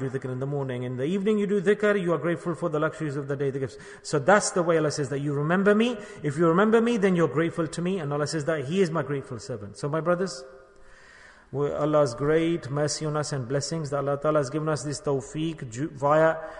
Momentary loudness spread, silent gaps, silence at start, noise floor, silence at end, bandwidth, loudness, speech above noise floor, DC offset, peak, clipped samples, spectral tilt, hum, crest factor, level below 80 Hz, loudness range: 11 LU; none; 0 s; -51 dBFS; 0 s; 10.5 kHz; -26 LUFS; 26 dB; under 0.1%; -6 dBFS; under 0.1%; -6 dB/octave; none; 20 dB; -58 dBFS; 5 LU